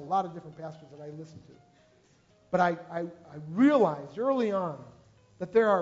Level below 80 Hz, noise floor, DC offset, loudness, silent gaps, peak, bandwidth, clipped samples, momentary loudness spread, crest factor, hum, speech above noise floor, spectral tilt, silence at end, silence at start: -70 dBFS; -63 dBFS; under 0.1%; -28 LUFS; none; -12 dBFS; 7.8 kHz; under 0.1%; 21 LU; 18 dB; none; 35 dB; -7.5 dB/octave; 0 s; 0 s